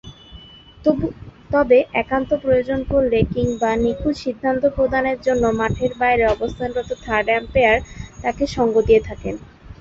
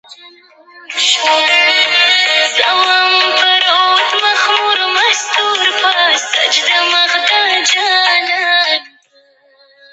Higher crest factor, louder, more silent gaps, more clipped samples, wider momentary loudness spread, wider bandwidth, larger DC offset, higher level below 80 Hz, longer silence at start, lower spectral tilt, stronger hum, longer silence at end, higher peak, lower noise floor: about the same, 16 dB vs 12 dB; second, -19 LUFS vs -10 LUFS; neither; neither; first, 10 LU vs 3 LU; second, 7.8 kHz vs 8.8 kHz; neither; first, -36 dBFS vs -76 dBFS; about the same, 0.05 s vs 0.1 s; first, -6.5 dB/octave vs 2 dB/octave; neither; second, 0.05 s vs 1.05 s; about the same, -2 dBFS vs 0 dBFS; second, -42 dBFS vs -50 dBFS